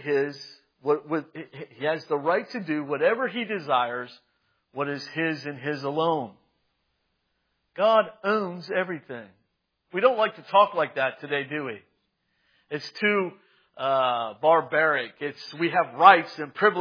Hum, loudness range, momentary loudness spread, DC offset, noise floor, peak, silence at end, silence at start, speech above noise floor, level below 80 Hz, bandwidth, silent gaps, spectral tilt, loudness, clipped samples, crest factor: none; 6 LU; 15 LU; under 0.1%; -75 dBFS; 0 dBFS; 0 s; 0 s; 50 dB; -86 dBFS; 5.2 kHz; none; -6 dB/octave; -25 LUFS; under 0.1%; 26 dB